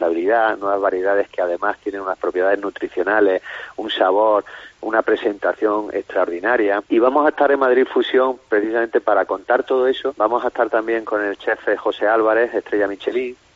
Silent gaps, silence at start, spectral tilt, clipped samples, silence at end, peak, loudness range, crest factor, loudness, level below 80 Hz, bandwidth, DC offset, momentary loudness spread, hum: none; 0 s; -1 dB/octave; under 0.1%; 0.2 s; -2 dBFS; 3 LU; 18 dB; -19 LUFS; -60 dBFS; 7.6 kHz; under 0.1%; 7 LU; none